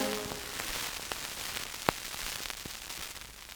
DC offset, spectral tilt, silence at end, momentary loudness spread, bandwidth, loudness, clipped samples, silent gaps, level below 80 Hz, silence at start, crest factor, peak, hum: under 0.1%; -1.5 dB/octave; 0 s; 7 LU; over 20 kHz; -36 LUFS; under 0.1%; none; -54 dBFS; 0 s; 34 dB; -4 dBFS; none